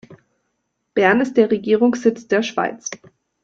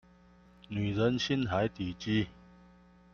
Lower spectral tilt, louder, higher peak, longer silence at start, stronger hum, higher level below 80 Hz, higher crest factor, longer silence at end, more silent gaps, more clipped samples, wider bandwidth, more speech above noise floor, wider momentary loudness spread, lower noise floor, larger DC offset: second, -4.5 dB/octave vs -6 dB/octave; first, -18 LUFS vs -32 LUFS; first, -2 dBFS vs -16 dBFS; second, 0.1 s vs 0.7 s; neither; second, -64 dBFS vs -58 dBFS; about the same, 18 dB vs 18 dB; second, 0.45 s vs 0.8 s; neither; neither; about the same, 7.8 kHz vs 7.2 kHz; first, 55 dB vs 29 dB; first, 14 LU vs 9 LU; first, -73 dBFS vs -60 dBFS; neither